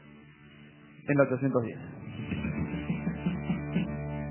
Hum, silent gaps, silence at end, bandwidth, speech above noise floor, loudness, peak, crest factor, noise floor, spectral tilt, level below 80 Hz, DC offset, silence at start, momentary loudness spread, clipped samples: none; none; 0 s; 3.2 kHz; 25 dB; -32 LUFS; -10 dBFS; 22 dB; -53 dBFS; -7.5 dB/octave; -50 dBFS; under 0.1%; 0 s; 15 LU; under 0.1%